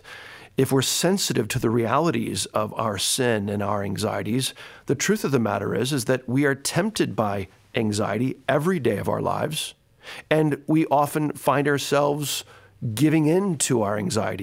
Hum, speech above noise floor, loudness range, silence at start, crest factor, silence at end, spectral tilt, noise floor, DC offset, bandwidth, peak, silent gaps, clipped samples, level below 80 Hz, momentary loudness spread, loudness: none; 20 dB; 2 LU; 0.05 s; 18 dB; 0 s; -4.5 dB/octave; -43 dBFS; under 0.1%; 16 kHz; -6 dBFS; none; under 0.1%; -58 dBFS; 8 LU; -23 LUFS